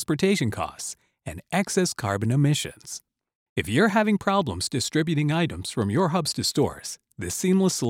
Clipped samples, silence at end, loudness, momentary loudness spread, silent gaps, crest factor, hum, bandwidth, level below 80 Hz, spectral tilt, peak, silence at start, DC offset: under 0.1%; 0 s; -24 LUFS; 14 LU; 3.35-3.56 s; 16 dB; none; 16.5 kHz; -54 dBFS; -5 dB/octave; -8 dBFS; 0 s; under 0.1%